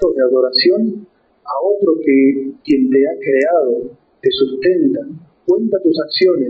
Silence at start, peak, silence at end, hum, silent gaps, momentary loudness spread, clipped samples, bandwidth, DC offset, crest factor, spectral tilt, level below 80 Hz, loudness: 0 s; -2 dBFS; 0 s; none; none; 10 LU; under 0.1%; 5.8 kHz; under 0.1%; 12 dB; -3 dB/octave; -54 dBFS; -15 LUFS